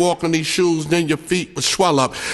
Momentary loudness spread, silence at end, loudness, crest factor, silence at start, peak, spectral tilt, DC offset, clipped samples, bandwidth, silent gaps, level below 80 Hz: 4 LU; 0 s; -18 LUFS; 16 dB; 0 s; -2 dBFS; -4 dB/octave; under 0.1%; under 0.1%; 12.5 kHz; none; -50 dBFS